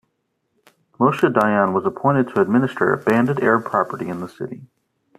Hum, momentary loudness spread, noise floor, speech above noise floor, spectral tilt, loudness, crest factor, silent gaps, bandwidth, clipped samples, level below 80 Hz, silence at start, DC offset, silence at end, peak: none; 13 LU; -72 dBFS; 53 dB; -8 dB/octave; -19 LUFS; 18 dB; none; 14 kHz; under 0.1%; -62 dBFS; 1 s; under 0.1%; 0.55 s; -2 dBFS